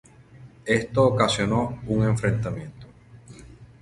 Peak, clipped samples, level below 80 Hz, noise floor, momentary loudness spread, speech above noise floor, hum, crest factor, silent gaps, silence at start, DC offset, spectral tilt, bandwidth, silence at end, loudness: -4 dBFS; under 0.1%; -48 dBFS; -48 dBFS; 15 LU; 25 dB; none; 20 dB; none; 0.35 s; under 0.1%; -6 dB/octave; 11.5 kHz; 0.15 s; -23 LUFS